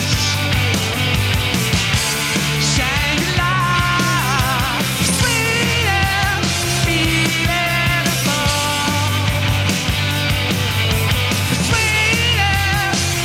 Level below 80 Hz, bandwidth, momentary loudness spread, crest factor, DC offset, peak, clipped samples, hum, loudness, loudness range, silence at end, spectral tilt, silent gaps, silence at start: -30 dBFS; 17 kHz; 3 LU; 14 dB; under 0.1%; -2 dBFS; under 0.1%; none; -16 LUFS; 1 LU; 0 s; -3.5 dB/octave; none; 0 s